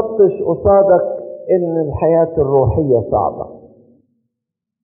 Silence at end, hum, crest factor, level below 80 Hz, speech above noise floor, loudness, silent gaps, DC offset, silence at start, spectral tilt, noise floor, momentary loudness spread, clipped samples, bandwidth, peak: 1.25 s; none; 14 dB; -38 dBFS; 67 dB; -14 LUFS; none; under 0.1%; 0 s; -7 dB/octave; -80 dBFS; 11 LU; under 0.1%; 2.8 kHz; -2 dBFS